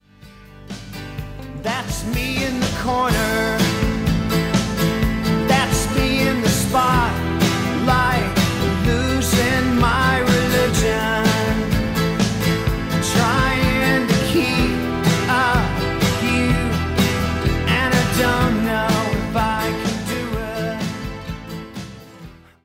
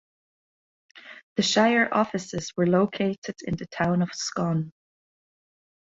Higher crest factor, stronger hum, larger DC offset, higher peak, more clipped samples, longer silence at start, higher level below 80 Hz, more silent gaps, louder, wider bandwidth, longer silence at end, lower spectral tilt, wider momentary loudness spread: second, 14 dB vs 20 dB; neither; neither; about the same, -6 dBFS vs -8 dBFS; neither; second, 0.25 s vs 0.95 s; first, -30 dBFS vs -60 dBFS; second, none vs 1.23-1.36 s, 3.18-3.22 s; first, -19 LUFS vs -25 LUFS; first, 16.5 kHz vs 7.8 kHz; second, 0.3 s vs 1.25 s; about the same, -5 dB/octave vs -5 dB/octave; second, 10 LU vs 13 LU